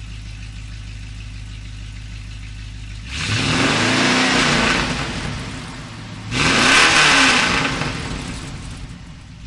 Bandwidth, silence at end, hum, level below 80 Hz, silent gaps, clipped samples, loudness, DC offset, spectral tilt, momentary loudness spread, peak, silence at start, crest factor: 11.5 kHz; 0 s; none; -36 dBFS; none; under 0.1%; -15 LUFS; under 0.1%; -3 dB/octave; 23 LU; 0 dBFS; 0 s; 20 dB